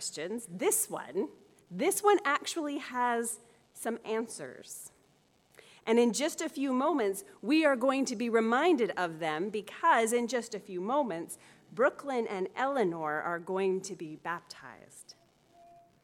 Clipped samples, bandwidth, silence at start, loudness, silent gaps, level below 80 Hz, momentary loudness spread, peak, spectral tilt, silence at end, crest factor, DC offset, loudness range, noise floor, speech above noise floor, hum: under 0.1%; 17.5 kHz; 0 s; -31 LUFS; none; -82 dBFS; 17 LU; -12 dBFS; -3.5 dB/octave; 0.9 s; 20 dB; under 0.1%; 6 LU; -68 dBFS; 36 dB; none